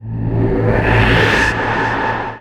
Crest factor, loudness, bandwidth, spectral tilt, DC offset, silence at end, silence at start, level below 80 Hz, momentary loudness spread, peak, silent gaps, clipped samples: 14 dB; -14 LUFS; 11.5 kHz; -6 dB/octave; under 0.1%; 0 s; 0 s; -26 dBFS; 7 LU; 0 dBFS; none; under 0.1%